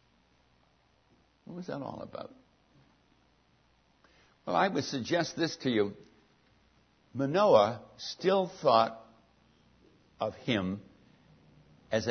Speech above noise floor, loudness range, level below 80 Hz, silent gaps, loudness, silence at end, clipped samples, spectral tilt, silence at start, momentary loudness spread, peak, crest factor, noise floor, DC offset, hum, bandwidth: 39 dB; 17 LU; -72 dBFS; none; -30 LUFS; 0 s; under 0.1%; -5.5 dB/octave; 1.45 s; 19 LU; -8 dBFS; 24 dB; -68 dBFS; under 0.1%; 60 Hz at -65 dBFS; 6.6 kHz